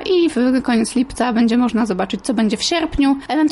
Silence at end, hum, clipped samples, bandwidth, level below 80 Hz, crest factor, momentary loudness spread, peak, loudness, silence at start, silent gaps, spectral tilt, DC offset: 0 s; none; under 0.1%; 11.5 kHz; -40 dBFS; 10 dB; 4 LU; -6 dBFS; -17 LUFS; 0 s; none; -4.5 dB/octave; under 0.1%